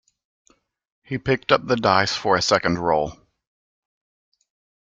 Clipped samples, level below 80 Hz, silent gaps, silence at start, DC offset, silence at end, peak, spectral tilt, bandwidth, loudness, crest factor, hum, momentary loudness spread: under 0.1%; -54 dBFS; none; 1.1 s; under 0.1%; 1.75 s; -2 dBFS; -4 dB/octave; 9.4 kHz; -20 LUFS; 22 dB; none; 9 LU